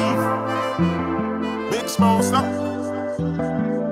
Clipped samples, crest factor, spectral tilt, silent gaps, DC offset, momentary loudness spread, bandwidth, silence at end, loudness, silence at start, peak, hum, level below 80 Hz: under 0.1%; 16 dB; -6 dB/octave; none; under 0.1%; 7 LU; 16 kHz; 0 s; -22 LUFS; 0 s; -4 dBFS; none; -48 dBFS